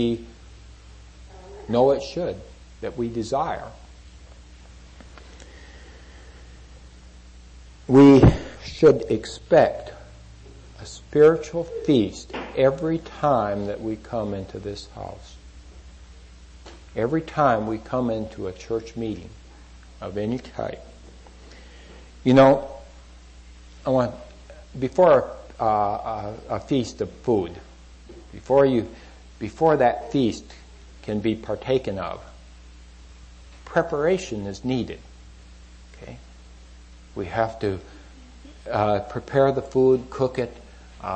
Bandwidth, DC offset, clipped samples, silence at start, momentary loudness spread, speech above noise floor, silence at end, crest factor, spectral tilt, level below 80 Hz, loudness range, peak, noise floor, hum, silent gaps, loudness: 8.6 kHz; under 0.1%; under 0.1%; 0 s; 22 LU; 24 dB; 0 s; 20 dB; -7 dB/octave; -42 dBFS; 13 LU; -4 dBFS; -46 dBFS; none; none; -22 LUFS